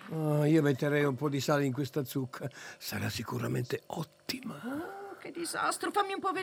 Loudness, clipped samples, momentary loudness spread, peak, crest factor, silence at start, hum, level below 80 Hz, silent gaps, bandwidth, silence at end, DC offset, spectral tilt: -33 LUFS; under 0.1%; 14 LU; -14 dBFS; 18 dB; 0 s; none; -74 dBFS; none; over 20 kHz; 0 s; under 0.1%; -5.5 dB/octave